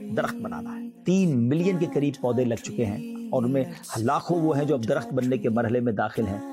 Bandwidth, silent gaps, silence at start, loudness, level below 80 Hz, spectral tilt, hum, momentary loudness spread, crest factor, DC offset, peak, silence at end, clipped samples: 16 kHz; none; 0 s; -26 LUFS; -66 dBFS; -7 dB/octave; none; 8 LU; 12 dB; under 0.1%; -12 dBFS; 0 s; under 0.1%